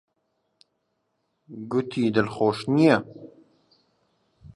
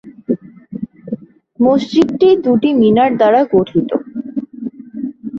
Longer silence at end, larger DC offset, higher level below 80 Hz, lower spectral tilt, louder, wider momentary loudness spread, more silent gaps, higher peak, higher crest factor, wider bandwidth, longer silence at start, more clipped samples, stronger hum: about the same, 0.1 s vs 0 s; neither; second, -64 dBFS vs -52 dBFS; about the same, -7 dB/octave vs -7.5 dB/octave; second, -23 LUFS vs -14 LUFS; first, 22 LU vs 17 LU; neither; about the same, -4 dBFS vs -2 dBFS; first, 22 dB vs 14 dB; first, 11.5 kHz vs 7.4 kHz; first, 1.5 s vs 0.05 s; neither; neither